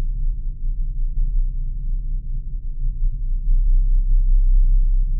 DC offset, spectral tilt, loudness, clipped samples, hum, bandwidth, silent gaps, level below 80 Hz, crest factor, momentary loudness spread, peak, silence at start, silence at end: under 0.1%; -24 dB/octave; -25 LUFS; under 0.1%; none; 0.4 kHz; none; -18 dBFS; 10 dB; 10 LU; -8 dBFS; 0 s; 0 s